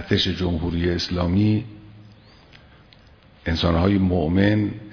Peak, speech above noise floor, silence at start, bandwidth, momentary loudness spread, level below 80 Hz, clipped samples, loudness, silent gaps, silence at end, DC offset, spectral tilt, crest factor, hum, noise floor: -4 dBFS; 30 dB; 0 s; 5.4 kHz; 7 LU; -38 dBFS; under 0.1%; -21 LUFS; none; 0 s; under 0.1%; -7 dB/octave; 18 dB; none; -51 dBFS